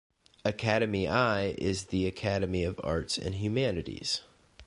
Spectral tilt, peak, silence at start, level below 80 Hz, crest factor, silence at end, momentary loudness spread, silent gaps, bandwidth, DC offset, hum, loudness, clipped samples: -5 dB/octave; -12 dBFS; 0.45 s; -48 dBFS; 20 dB; 0 s; 6 LU; none; 11.5 kHz; under 0.1%; none; -31 LUFS; under 0.1%